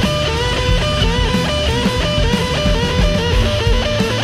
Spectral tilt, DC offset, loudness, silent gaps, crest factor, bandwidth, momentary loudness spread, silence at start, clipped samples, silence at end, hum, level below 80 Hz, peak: -5 dB/octave; under 0.1%; -16 LUFS; none; 12 dB; 15 kHz; 1 LU; 0 s; under 0.1%; 0 s; none; -20 dBFS; -4 dBFS